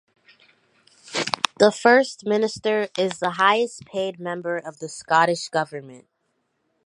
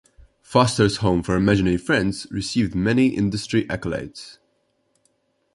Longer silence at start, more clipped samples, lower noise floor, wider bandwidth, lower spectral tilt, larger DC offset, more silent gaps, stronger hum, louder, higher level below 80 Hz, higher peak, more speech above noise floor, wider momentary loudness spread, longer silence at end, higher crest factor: first, 1.1 s vs 0.5 s; neither; first, -72 dBFS vs -68 dBFS; about the same, 11.5 kHz vs 11.5 kHz; second, -3.5 dB/octave vs -6 dB/octave; neither; neither; neither; about the same, -22 LUFS vs -21 LUFS; second, -70 dBFS vs -42 dBFS; about the same, 0 dBFS vs -2 dBFS; about the same, 51 dB vs 48 dB; first, 13 LU vs 10 LU; second, 0.9 s vs 1.2 s; about the same, 24 dB vs 20 dB